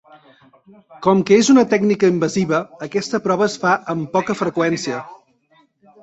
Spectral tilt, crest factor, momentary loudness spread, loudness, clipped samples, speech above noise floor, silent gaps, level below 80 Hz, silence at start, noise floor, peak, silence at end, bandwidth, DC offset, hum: -5.5 dB/octave; 16 dB; 10 LU; -17 LUFS; under 0.1%; 40 dB; none; -60 dBFS; 0.9 s; -58 dBFS; -2 dBFS; 0.9 s; 8.2 kHz; under 0.1%; none